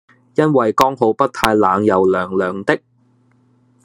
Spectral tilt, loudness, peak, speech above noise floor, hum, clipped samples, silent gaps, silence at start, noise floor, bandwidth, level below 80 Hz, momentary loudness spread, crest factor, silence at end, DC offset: -6 dB/octave; -16 LUFS; 0 dBFS; 41 dB; none; under 0.1%; none; 0.4 s; -56 dBFS; 13 kHz; -52 dBFS; 6 LU; 16 dB; 1.1 s; under 0.1%